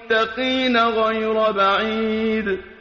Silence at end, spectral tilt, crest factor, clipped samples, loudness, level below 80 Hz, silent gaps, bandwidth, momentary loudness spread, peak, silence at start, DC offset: 0.05 s; -1.5 dB/octave; 14 dB; under 0.1%; -19 LUFS; -50 dBFS; none; 7.2 kHz; 4 LU; -6 dBFS; 0 s; under 0.1%